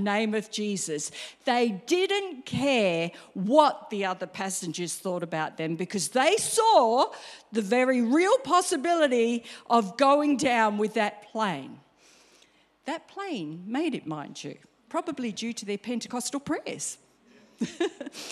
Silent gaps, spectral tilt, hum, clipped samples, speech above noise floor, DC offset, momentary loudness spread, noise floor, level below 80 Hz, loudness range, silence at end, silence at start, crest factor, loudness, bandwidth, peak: none; -3.5 dB/octave; none; under 0.1%; 35 dB; under 0.1%; 13 LU; -62 dBFS; -70 dBFS; 10 LU; 0 s; 0 s; 22 dB; -27 LUFS; 14.5 kHz; -6 dBFS